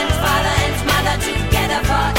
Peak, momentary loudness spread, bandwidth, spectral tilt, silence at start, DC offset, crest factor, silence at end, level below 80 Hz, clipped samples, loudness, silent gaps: -2 dBFS; 2 LU; 16.5 kHz; -4 dB/octave; 0 s; 0.9%; 16 dB; 0 s; -24 dBFS; under 0.1%; -17 LUFS; none